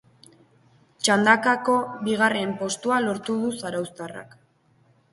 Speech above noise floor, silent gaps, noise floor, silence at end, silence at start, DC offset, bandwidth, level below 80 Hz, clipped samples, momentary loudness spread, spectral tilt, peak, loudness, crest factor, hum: 39 dB; none; -62 dBFS; 0.9 s; 1 s; under 0.1%; 11.5 kHz; -68 dBFS; under 0.1%; 15 LU; -3.5 dB/octave; -2 dBFS; -23 LUFS; 24 dB; none